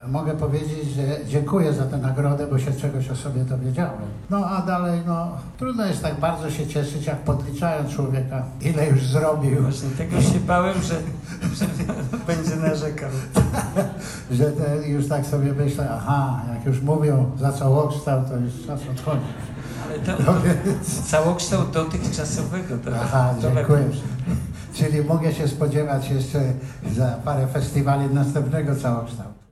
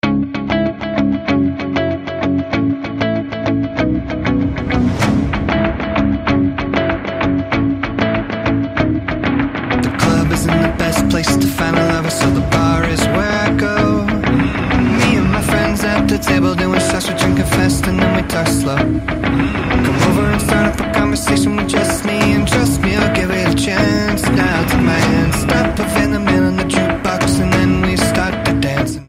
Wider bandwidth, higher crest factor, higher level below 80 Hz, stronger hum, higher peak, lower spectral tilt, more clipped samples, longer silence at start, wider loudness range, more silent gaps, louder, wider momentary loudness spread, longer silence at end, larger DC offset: second, 14 kHz vs 16 kHz; about the same, 18 dB vs 14 dB; second, -42 dBFS vs -28 dBFS; neither; second, -4 dBFS vs 0 dBFS; first, -7 dB/octave vs -5.5 dB/octave; neither; about the same, 0 s vs 0.05 s; about the same, 3 LU vs 3 LU; neither; second, -23 LUFS vs -15 LUFS; first, 8 LU vs 4 LU; about the same, 0.15 s vs 0.05 s; neither